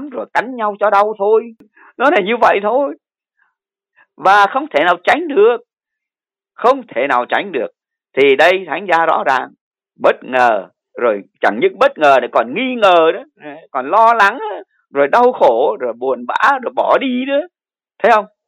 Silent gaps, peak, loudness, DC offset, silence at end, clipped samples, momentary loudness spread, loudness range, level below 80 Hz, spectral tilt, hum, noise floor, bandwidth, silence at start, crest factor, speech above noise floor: 9.61-9.71 s; 0 dBFS; -14 LUFS; under 0.1%; 0.2 s; under 0.1%; 12 LU; 3 LU; -66 dBFS; -4.5 dB/octave; none; -89 dBFS; 12.5 kHz; 0 s; 14 dB; 76 dB